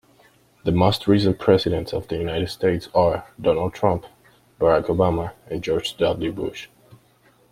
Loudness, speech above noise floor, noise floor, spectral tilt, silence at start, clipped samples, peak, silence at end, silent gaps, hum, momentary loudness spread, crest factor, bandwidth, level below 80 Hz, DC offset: -22 LUFS; 37 dB; -57 dBFS; -7 dB/octave; 0.65 s; under 0.1%; -2 dBFS; 0.55 s; none; none; 10 LU; 20 dB; 16 kHz; -46 dBFS; under 0.1%